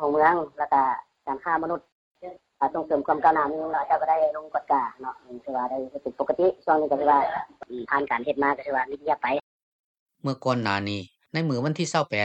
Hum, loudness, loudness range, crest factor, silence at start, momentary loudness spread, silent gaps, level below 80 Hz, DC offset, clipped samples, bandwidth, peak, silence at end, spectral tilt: none; -25 LUFS; 3 LU; 20 dB; 0 s; 13 LU; 1.92-2.15 s, 9.43-10.06 s; -66 dBFS; under 0.1%; under 0.1%; 9 kHz; -6 dBFS; 0 s; -5.5 dB/octave